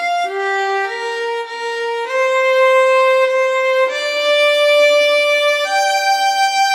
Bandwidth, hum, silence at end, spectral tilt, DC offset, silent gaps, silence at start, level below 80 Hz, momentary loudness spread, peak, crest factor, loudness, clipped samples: 16 kHz; none; 0 s; 3 dB/octave; under 0.1%; none; 0 s; under -90 dBFS; 9 LU; -4 dBFS; 12 dB; -14 LUFS; under 0.1%